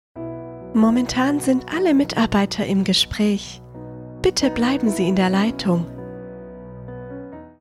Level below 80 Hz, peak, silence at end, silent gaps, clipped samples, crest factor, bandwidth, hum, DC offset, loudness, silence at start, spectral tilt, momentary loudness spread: -44 dBFS; -4 dBFS; 0.1 s; none; under 0.1%; 16 dB; 15 kHz; none; under 0.1%; -19 LUFS; 0.15 s; -5 dB/octave; 19 LU